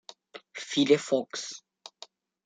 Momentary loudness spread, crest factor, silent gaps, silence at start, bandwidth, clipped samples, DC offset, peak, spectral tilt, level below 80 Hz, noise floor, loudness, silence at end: 25 LU; 22 dB; none; 0.35 s; 9.4 kHz; under 0.1%; under 0.1%; -8 dBFS; -4 dB/octave; -82 dBFS; -53 dBFS; -27 LUFS; 0.85 s